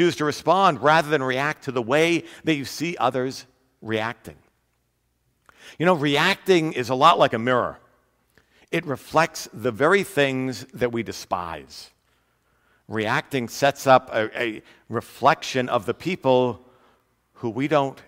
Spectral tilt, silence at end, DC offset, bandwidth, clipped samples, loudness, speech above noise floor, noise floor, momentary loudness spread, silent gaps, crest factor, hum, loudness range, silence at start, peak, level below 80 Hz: -5 dB/octave; 0.05 s; under 0.1%; 16 kHz; under 0.1%; -22 LUFS; 48 dB; -70 dBFS; 13 LU; none; 22 dB; none; 7 LU; 0 s; -2 dBFS; -62 dBFS